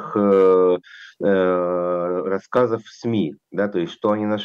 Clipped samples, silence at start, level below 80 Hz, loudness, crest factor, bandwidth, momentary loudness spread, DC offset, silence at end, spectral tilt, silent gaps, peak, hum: under 0.1%; 0 s; -68 dBFS; -20 LUFS; 14 dB; 7 kHz; 10 LU; under 0.1%; 0 s; -7.5 dB/octave; none; -6 dBFS; none